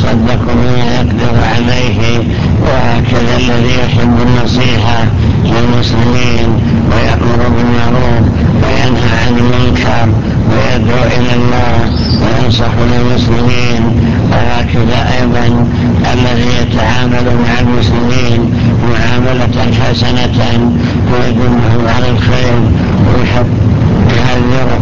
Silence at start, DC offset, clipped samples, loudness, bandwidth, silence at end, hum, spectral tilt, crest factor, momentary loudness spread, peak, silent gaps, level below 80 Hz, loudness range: 0 s; 20%; 0.3%; -10 LUFS; 7.4 kHz; 0 s; none; -7 dB/octave; 10 dB; 2 LU; 0 dBFS; none; -18 dBFS; 1 LU